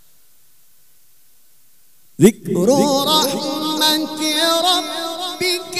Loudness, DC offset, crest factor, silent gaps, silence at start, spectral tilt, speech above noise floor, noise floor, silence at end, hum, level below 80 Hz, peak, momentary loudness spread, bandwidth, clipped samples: -16 LUFS; 0.5%; 20 dB; none; 2.2 s; -3.5 dB/octave; 40 dB; -56 dBFS; 0 s; none; -60 dBFS; 0 dBFS; 7 LU; 16 kHz; under 0.1%